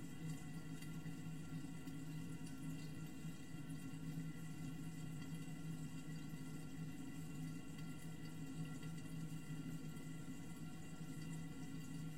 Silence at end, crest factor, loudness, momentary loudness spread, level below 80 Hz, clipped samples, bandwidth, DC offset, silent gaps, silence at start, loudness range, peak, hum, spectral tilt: 0 s; 12 dB; -51 LUFS; 3 LU; -68 dBFS; under 0.1%; 16 kHz; 0.2%; none; 0 s; 1 LU; -36 dBFS; none; -6 dB/octave